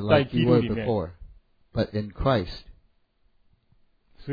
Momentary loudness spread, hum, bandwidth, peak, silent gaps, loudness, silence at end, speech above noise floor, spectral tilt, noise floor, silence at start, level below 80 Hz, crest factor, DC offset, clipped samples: 16 LU; none; 5 kHz; -6 dBFS; none; -25 LUFS; 0 s; 41 dB; -9 dB/octave; -65 dBFS; 0 s; -44 dBFS; 22 dB; under 0.1%; under 0.1%